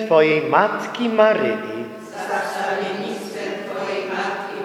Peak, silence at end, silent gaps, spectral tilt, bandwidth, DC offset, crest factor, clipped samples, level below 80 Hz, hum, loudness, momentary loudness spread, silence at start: 0 dBFS; 0 s; none; -5 dB/octave; 14.5 kHz; under 0.1%; 20 dB; under 0.1%; -74 dBFS; none; -21 LUFS; 12 LU; 0 s